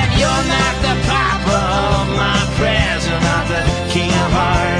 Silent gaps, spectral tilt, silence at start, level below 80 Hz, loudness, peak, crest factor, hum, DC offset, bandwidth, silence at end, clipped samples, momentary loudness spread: none; -4.5 dB/octave; 0 s; -24 dBFS; -15 LUFS; -2 dBFS; 14 dB; none; under 0.1%; 10.5 kHz; 0 s; under 0.1%; 2 LU